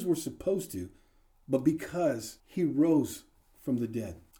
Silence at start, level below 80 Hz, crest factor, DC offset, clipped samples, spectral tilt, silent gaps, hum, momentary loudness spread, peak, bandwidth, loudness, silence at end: 0 s; -62 dBFS; 18 dB; under 0.1%; under 0.1%; -6.5 dB/octave; none; none; 14 LU; -14 dBFS; over 20 kHz; -31 LUFS; 0.2 s